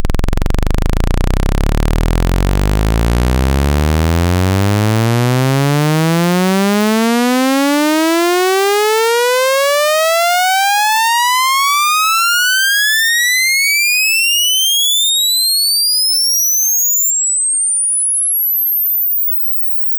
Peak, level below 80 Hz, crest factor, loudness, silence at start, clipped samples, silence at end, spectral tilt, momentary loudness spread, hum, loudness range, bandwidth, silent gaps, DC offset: -6 dBFS; -20 dBFS; 6 dB; -12 LUFS; 0 s; under 0.1%; 0 s; -3 dB/octave; 6 LU; none; 5 LU; over 20 kHz; none; under 0.1%